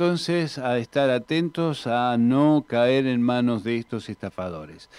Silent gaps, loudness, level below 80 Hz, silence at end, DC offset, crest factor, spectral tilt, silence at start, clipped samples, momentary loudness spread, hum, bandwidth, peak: none; -23 LUFS; -62 dBFS; 0.15 s; under 0.1%; 14 dB; -6.5 dB/octave; 0 s; under 0.1%; 13 LU; none; 11.5 kHz; -8 dBFS